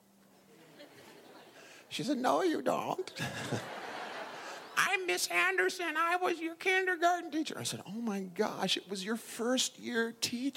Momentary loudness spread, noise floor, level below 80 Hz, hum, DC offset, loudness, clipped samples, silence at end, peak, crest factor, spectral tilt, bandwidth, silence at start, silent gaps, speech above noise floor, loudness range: 12 LU; -63 dBFS; -82 dBFS; none; under 0.1%; -33 LUFS; under 0.1%; 0 s; -12 dBFS; 22 dB; -3 dB/octave; 16.5 kHz; 0.6 s; none; 30 dB; 5 LU